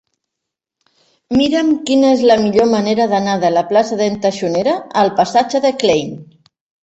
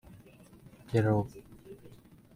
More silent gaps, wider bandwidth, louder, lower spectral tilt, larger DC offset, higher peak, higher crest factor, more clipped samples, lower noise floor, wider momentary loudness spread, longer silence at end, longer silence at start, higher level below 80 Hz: neither; second, 8.2 kHz vs 16 kHz; first, -14 LUFS vs -31 LUFS; second, -5 dB/octave vs -8.5 dB/octave; neither; first, -2 dBFS vs -14 dBFS; second, 14 dB vs 20 dB; neither; first, -80 dBFS vs -56 dBFS; second, 6 LU vs 24 LU; first, 0.6 s vs 0.45 s; first, 1.3 s vs 0.15 s; first, -54 dBFS vs -60 dBFS